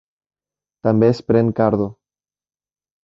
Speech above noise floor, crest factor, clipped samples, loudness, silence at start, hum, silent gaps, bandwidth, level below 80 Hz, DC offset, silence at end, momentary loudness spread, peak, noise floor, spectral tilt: over 74 dB; 18 dB; under 0.1%; -18 LUFS; 0.85 s; none; none; 7.4 kHz; -52 dBFS; under 0.1%; 1.15 s; 8 LU; -2 dBFS; under -90 dBFS; -9.5 dB/octave